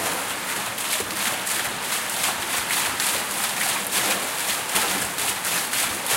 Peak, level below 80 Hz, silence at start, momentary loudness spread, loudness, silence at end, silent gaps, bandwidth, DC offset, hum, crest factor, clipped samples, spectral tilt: -4 dBFS; -58 dBFS; 0 s; 4 LU; -22 LUFS; 0 s; none; 17 kHz; under 0.1%; none; 22 dB; under 0.1%; 0 dB/octave